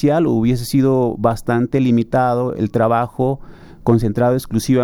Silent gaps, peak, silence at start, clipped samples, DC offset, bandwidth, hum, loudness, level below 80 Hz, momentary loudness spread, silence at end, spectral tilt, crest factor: none; -2 dBFS; 0 s; under 0.1%; under 0.1%; 17.5 kHz; none; -17 LUFS; -40 dBFS; 4 LU; 0 s; -7.5 dB/octave; 14 dB